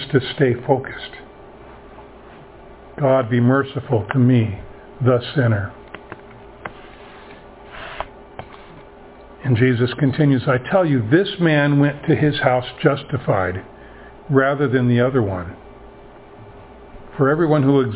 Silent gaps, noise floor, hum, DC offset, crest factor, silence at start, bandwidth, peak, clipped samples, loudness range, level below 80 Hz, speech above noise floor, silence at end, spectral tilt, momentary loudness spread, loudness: none; -42 dBFS; none; under 0.1%; 20 dB; 0 s; 4 kHz; 0 dBFS; under 0.1%; 9 LU; -46 dBFS; 25 dB; 0 s; -11.5 dB/octave; 22 LU; -18 LUFS